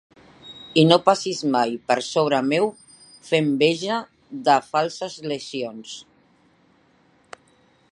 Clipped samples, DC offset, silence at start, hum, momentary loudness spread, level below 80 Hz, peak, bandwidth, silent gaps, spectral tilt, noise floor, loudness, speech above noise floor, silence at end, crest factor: under 0.1%; under 0.1%; 0.45 s; none; 18 LU; -70 dBFS; 0 dBFS; 11.5 kHz; none; -5 dB/octave; -59 dBFS; -21 LUFS; 38 dB; 1.9 s; 22 dB